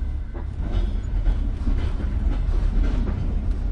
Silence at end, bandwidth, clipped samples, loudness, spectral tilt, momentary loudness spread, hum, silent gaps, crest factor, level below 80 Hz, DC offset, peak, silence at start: 0 s; 5.4 kHz; under 0.1%; -27 LUFS; -8.5 dB/octave; 5 LU; none; none; 12 dB; -22 dBFS; under 0.1%; -10 dBFS; 0 s